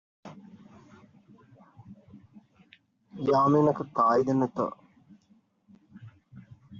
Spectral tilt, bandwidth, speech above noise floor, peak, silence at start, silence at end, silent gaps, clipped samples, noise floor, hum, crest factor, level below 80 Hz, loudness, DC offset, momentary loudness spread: -7.5 dB/octave; 7.4 kHz; 41 dB; -12 dBFS; 0.25 s; 0 s; none; under 0.1%; -65 dBFS; none; 20 dB; -70 dBFS; -25 LUFS; under 0.1%; 27 LU